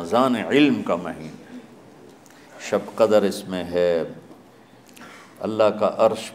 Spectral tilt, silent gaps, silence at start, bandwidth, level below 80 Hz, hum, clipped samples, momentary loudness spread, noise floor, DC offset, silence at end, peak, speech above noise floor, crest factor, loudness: -5.5 dB/octave; none; 0 s; 15.5 kHz; -64 dBFS; none; under 0.1%; 24 LU; -49 dBFS; under 0.1%; 0 s; -4 dBFS; 29 dB; 20 dB; -21 LUFS